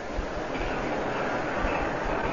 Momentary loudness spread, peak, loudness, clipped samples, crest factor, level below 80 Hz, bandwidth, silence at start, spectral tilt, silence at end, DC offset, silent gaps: 4 LU; -14 dBFS; -30 LUFS; under 0.1%; 14 dB; -38 dBFS; 7.4 kHz; 0 s; -5.5 dB/octave; 0 s; 0.6%; none